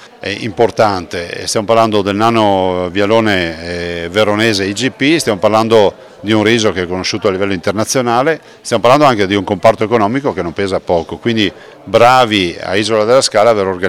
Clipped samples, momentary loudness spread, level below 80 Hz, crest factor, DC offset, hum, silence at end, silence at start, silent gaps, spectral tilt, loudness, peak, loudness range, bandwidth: 0.9%; 9 LU; -46 dBFS; 12 dB; under 0.1%; none; 0 s; 0 s; none; -4.5 dB/octave; -13 LUFS; 0 dBFS; 1 LU; 17 kHz